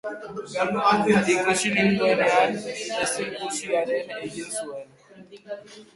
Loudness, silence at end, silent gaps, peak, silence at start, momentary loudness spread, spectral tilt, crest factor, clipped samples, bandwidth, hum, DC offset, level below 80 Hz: -23 LUFS; 0.1 s; none; -6 dBFS; 0.05 s; 17 LU; -4 dB/octave; 18 dB; under 0.1%; 11.5 kHz; none; under 0.1%; -62 dBFS